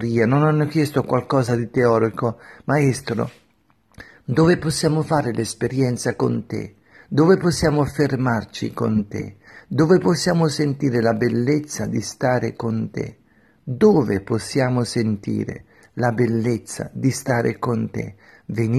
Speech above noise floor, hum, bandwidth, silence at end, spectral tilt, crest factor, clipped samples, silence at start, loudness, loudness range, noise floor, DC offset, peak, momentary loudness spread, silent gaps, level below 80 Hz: 41 dB; none; 13.5 kHz; 0 s; -6.5 dB/octave; 16 dB; under 0.1%; 0 s; -20 LUFS; 3 LU; -61 dBFS; under 0.1%; -4 dBFS; 14 LU; none; -50 dBFS